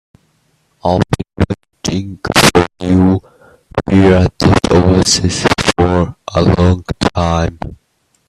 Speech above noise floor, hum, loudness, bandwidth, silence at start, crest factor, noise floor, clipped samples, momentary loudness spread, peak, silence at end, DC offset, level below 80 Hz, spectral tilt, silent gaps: 48 dB; none; -13 LUFS; 14 kHz; 0.85 s; 14 dB; -60 dBFS; under 0.1%; 11 LU; 0 dBFS; 0.55 s; under 0.1%; -32 dBFS; -5 dB/octave; none